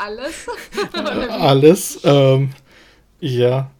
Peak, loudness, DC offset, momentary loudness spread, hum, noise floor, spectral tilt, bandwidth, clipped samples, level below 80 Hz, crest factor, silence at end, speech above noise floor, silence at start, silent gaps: 0 dBFS; -16 LUFS; under 0.1%; 16 LU; none; -49 dBFS; -6 dB/octave; 19 kHz; under 0.1%; -48 dBFS; 16 dB; 0.1 s; 33 dB; 0 s; none